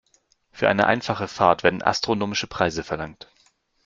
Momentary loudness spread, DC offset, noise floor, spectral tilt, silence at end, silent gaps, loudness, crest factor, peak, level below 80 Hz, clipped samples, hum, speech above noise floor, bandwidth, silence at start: 11 LU; under 0.1%; -64 dBFS; -4.5 dB/octave; 0.75 s; none; -22 LUFS; 22 dB; -2 dBFS; -54 dBFS; under 0.1%; none; 42 dB; 7.6 kHz; 0.55 s